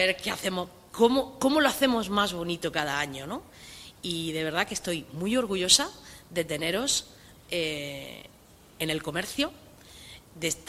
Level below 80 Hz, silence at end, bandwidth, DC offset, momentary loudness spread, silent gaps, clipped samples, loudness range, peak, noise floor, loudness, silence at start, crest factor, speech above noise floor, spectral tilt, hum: -56 dBFS; 0 s; 16 kHz; under 0.1%; 20 LU; none; under 0.1%; 5 LU; -6 dBFS; -49 dBFS; -27 LUFS; 0 s; 24 dB; 21 dB; -2.5 dB/octave; none